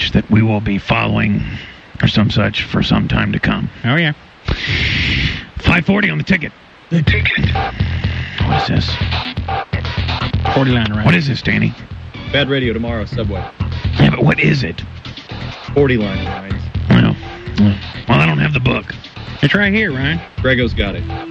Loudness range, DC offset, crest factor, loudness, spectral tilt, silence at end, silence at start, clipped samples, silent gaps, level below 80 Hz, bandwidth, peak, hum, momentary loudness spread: 2 LU; under 0.1%; 14 dB; -15 LUFS; -7 dB/octave; 0 s; 0 s; under 0.1%; none; -28 dBFS; 7.6 kHz; -2 dBFS; none; 11 LU